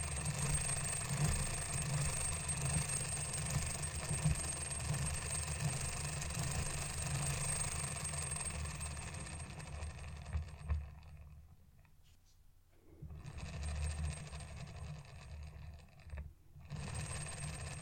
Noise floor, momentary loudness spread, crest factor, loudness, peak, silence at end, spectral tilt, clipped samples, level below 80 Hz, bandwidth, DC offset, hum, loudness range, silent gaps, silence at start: -65 dBFS; 16 LU; 18 dB; -40 LUFS; -22 dBFS; 0 s; -3.5 dB/octave; under 0.1%; -48 dBFS; 17 kHz; under 0.1%; none; 12 LU; none; 0 s